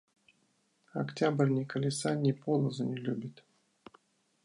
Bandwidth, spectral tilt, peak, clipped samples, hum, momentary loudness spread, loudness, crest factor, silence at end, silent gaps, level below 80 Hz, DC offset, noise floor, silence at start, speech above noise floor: 11 kHz; -6.5 dB/octave; -14 dBFS; under 0.1%; none; 10 LU; -32 LUFS; 20 dB; 1.15 s; none; -78 dBFS; under 0.1%; -73 dBFS; 0.95 s; 42 dB